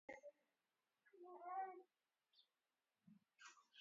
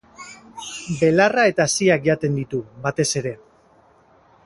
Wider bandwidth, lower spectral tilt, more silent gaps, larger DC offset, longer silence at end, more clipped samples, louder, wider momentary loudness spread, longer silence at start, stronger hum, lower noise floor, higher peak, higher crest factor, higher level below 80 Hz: second, 7.4 kHz vs 11.5 kHz; second, -1.5 dB/octave vs -4.5 dB/octave; neither; neither; second, 0 s vs 1.1 s; neither; second, -56 LUFS vs -19 LUFS; second, 15 LU vs 21 LU; about the same, 0.1 s vs 0.2 s; neither; first, under -90 dBFS vs -55 dBFS; second, -40 dBFS vs -2 dBFS; about the same, 20 dB vs 20 dB; second, under -90 dBFS vs -56 dBFS